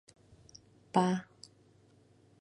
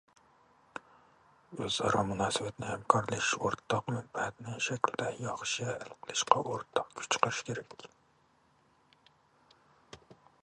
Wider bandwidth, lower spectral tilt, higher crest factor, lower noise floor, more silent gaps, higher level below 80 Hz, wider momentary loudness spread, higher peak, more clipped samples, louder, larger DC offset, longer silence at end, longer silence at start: about the same, 11 kHz vs 11.5 kHz; first, -6.5 dB/octave vs -3.5 dB/octave; second, 26 dB vs 32 dB; second, -64 dBFS vs -69 dBFS; neither; second, -74 dBFS vs -66 dBFS; first, 26 LU vs 20 LU; second, -12 dBFS vs -4 dBFS; neither; about the same, -32 LUFS vs -33 LUFS; neither; first, 1.2 s vs 0.3 s; first, 0.95 s vs 0.75 s